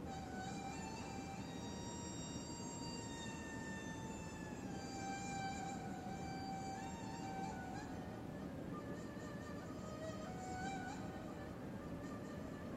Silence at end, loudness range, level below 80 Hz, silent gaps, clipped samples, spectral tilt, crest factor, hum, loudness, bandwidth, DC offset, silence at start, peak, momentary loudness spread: 0 s; 2 LU; -64 dBFS; none; under 0.1%; -5 dB/octave; 14 dB; none; -48 LUFS; 16 kHz; under 0.1%; 0 s; -34 dBFS; 4 LU